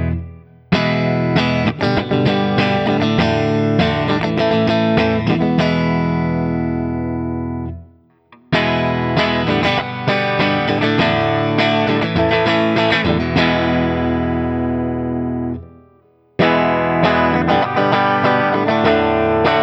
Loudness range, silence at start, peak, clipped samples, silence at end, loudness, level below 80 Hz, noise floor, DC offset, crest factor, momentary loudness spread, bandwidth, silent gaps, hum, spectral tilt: 4 LU; 0 s; -2 dBFS; under 0.1%; 0 s; -16 LUFS; -38 dBFS; -53 dBFS; under 0.1%; 16 dB; 7 LU; 8 kHz; none; none; -7 dB/octave